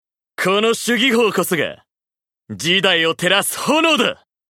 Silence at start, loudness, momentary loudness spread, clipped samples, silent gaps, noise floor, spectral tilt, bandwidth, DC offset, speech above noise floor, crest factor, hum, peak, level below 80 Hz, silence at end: 0.4 s; -16 LUFS; 10 LU; under 0.1%; none; under -90 dBFS; -3 dB/octave; 17 kHz; under 0.1%; over 73 dB; 18 dB; none; 0 dBFS; -64 dBFS; 0.35 s